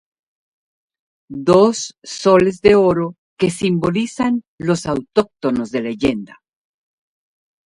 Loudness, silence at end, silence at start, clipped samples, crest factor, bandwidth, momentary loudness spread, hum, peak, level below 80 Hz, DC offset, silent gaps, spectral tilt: -17 LUFS; 1.4 s; 1.3 s; under 0.1%; 18 dB; 11.5 kHz; 10 LU; none; 0 dBFS; -48 dBFS; under 0.1%; 3.18-3.36 s, 4.48-4.58 s; -6 dB/octave